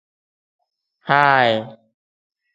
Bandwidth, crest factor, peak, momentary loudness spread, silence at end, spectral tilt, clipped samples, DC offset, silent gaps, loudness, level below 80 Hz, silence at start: 7.8 kHz; 22 dB; 0 dBFS; 22 LU; 0.8 s; -6 dB/octave; under 0.1%; under 0.1%; none; -16 LUFS; -66 dBFS; 1.05 s